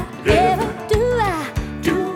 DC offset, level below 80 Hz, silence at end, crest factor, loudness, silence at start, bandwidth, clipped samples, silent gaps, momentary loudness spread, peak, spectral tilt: under 0.1%; -32 dBFS; 0 s; 18 dB; -19 LUFS; 0 s; 18.5 kHz; under 0.1%; none; 8 LU; -2 dBFS; -6 dB/octave